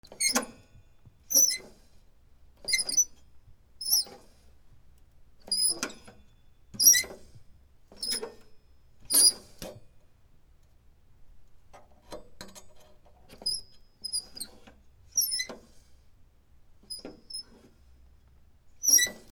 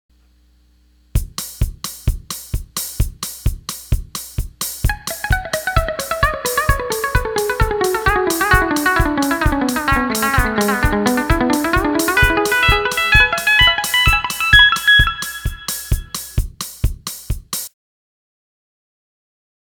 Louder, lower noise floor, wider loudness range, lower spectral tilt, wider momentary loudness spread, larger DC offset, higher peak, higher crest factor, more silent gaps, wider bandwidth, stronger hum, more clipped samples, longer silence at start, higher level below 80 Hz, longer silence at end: second, -25 LUFS vs -16 LUFS; first, -58 dBFS vs -53 dBFS; about the same, 12 LU vs 13 LU; second, 1.5 dB/octave vs -3.5 dB/octave; first, 25 LU vs 14 LU; neither; second, -6 dBFS vs 0 dBFS; first, 28 dB vs 18 dB; neither; about the same, over 20 kHz vs 19.5 kHz; neither; neither; second, 0.1 s vs 1.15 s; second, -60 dBFS vs -24 dBFS; second, 0.15 s vs 2 s